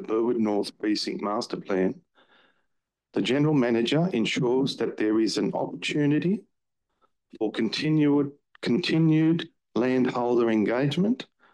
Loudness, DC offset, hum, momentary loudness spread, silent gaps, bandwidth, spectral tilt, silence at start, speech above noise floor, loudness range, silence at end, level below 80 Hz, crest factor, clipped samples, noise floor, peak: -25 LUFS; under 0.1%; none; 8 LU; none; 11.5 kHz; -6.5 dB/octave; 0 s; 56 dB; 3 LU; 0.3 s; -72 dBFS; 12 dB; under 0.1%; -80 dBFS; -12 dBFS